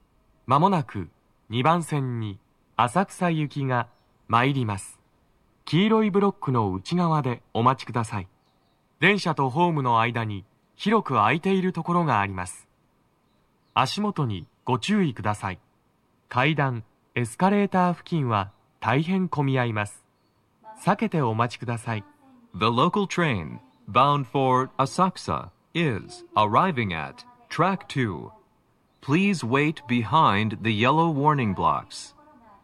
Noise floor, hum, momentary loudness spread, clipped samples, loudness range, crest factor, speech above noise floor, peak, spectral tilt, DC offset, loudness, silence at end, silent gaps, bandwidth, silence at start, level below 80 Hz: -66 dBFS; none; 14 LU; under 0.1%; 4 LU; 20 dB; 42 dB; -4 dBFS; -6.5 dB/octave; under 0.1%; -24 LUFS; 0.55 s; none; 13 kHz; 0.5 s; -62 dBFS